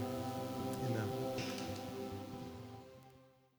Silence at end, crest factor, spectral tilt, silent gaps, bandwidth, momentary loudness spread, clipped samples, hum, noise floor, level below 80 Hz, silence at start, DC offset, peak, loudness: 0.25 s; 18 dB; -6 dB/octave; none; over 20 kHz; 16 LU; under 0.1%; none; -65 dBFS; -68 dBFS; 0 s; under 0.1%; -24 dBFS; -42 LUFS